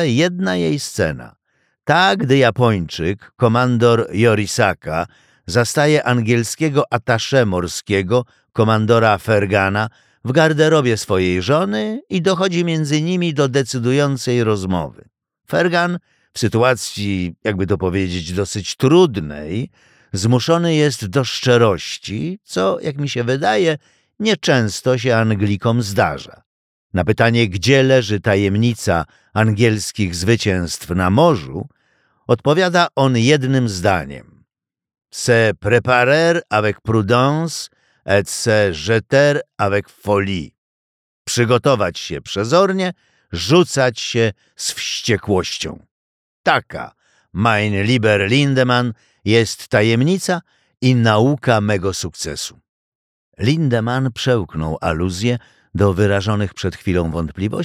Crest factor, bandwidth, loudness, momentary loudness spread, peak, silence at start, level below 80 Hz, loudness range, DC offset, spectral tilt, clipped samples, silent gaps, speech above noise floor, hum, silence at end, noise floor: 16 dB; 15 kHz; -17 LUFS; 11 LU; -2 dBFS; 0 s; -46 dBFS; 3 LU; under 0.1%; -5.5 dB/octave; under 0.1%; 26.46-26.90 s, 40.58-41.25 s, 45.91-46.44 s, 52.69-53.32 s; 71 dB; none; 0 s; -87 dBFS